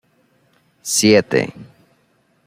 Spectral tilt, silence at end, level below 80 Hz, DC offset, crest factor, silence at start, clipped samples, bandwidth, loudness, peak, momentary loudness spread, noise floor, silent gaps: -3.5 dB/octave; 0.8 s; -58 dBFS; under 0.1%; 18 dB; 0.85 s; under 0.1%; 16 kHz; -16 LUFS; -2 dBFS; 16 LU; -61 dBFS; none